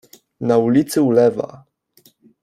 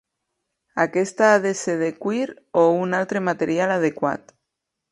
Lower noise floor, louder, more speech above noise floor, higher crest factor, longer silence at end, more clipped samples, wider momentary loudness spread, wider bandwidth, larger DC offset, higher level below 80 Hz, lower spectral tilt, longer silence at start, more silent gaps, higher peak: second, -55 dBFS vs -81 dBFS; first, -17 LUFS vs -21 LUFS; second, 40 dB vs 60 dB; about the same, 16 dB vs 18 dB; about the same, 0.85 s vs 0.75 s; neither; first, 13 LU vs 9 LU; first, 15.5 kHz vs 11.5 kHz; neither; first, -60 dBFS vs -68 dBFS; about the same, -6.5 dB/octave vs -5.5 dB/octave; second, 0.4 s vs 0.75 s; neither; about the same, -2 dBFS vs -4 dBFS